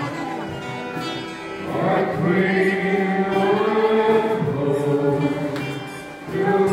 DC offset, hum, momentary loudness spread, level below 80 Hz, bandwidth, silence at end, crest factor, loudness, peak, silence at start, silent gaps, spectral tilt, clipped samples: under 0.1%; none; 11 LU; -56 dBFS; 15.5 kHz; 0 s; 14 dB; -21 LUFS; -6 dBFS; 0 s; none; -7 dB/octave; under 0.1%